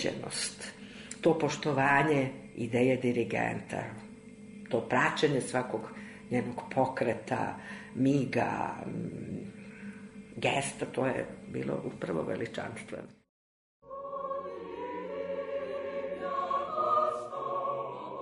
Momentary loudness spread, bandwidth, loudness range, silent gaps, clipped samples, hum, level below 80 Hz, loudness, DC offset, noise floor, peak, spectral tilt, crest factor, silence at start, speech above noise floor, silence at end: 17 LU; 11 kHz; 9 LU; 13.29-13.82 s; under 0.1%; none; -66 dBFS; -32 LUFS; under 0.1%; under -90 dBFS; -14 dBFS; -5.5 dB/octave; 20 dB; 0 s; over 59 dB; 0 s